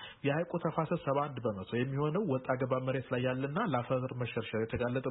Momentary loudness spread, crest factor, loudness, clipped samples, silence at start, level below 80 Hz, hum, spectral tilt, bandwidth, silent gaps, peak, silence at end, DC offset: 3 LU; 18 dB; -34 LUFS; under 0.1%; 0 s; -64 dBFS; none; -5 dB/octave; 3.9 kHz; none; -16 dBFS; 0 s; under 0.1%